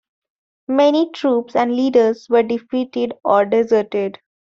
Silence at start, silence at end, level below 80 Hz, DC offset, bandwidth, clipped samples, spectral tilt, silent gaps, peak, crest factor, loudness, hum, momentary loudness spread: 0.7 s; 0.3 s; -64 dBFS; under 0.1%; 7.2 kHz; under 0.1%; -6 dB/octave; none; -2 dBFS; 14 dB; -17 LUFS; none; 8 LU